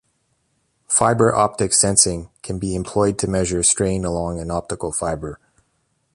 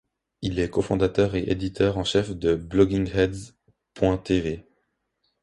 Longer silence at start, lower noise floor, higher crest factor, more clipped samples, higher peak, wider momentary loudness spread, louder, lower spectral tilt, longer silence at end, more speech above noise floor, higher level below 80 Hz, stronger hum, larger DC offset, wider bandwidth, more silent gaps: first, 0.9 s vs 0.4 s; second, -68 dBFS vs -74 dBFS; about the same, 20 dB vs 18 dB; neither; first, 0 dBFS vs -6 dBFS; first, 12 LU vs 8 LU; first, -18 LUFS vs -24 LUFS; second, -3.5 dB/octave vs -6.5 dB/octave; about the same, 0.8 s vs 0.8 s; about the same, 48 dB vs 51 dB; about the same, -40 dBFS vs -42 dBFS; neither; neither; about the same, 11.5 kHz vs 11.5 kHz; neither